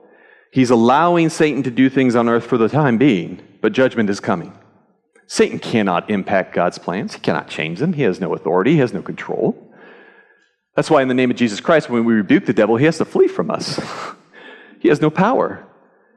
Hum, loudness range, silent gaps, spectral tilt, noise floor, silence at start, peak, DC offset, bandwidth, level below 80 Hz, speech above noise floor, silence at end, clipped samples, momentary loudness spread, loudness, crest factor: none; 5 LU; none; -6.5 dB/octave; -58 dBFS; 0.55 s; -4 dBFS; under 0.1%; 11.5 kHz; -62 dBFS; 41 dB; 0.55 s; under 0.1%; 10 LU; -17 LUFS; 14 dB